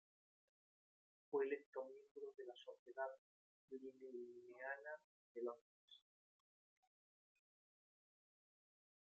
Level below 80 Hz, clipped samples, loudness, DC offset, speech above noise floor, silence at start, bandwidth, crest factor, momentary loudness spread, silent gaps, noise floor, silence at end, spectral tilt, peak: under -90 dBFS; under 0.1%; -52 LUFS; under 0.1%; over 37 dB; 1.3 s; 7.2 kHz; 22 dB; 18 LU; 1.66-1.73 s, 2.11-2.15 s, 2.79-2.86 s, 3.18-3.68 s, 5.04-5.35 s, 5.61-5.88 s; under -90 dBFS; 3.25 s; -1.5 dB/octave; -32 dBFS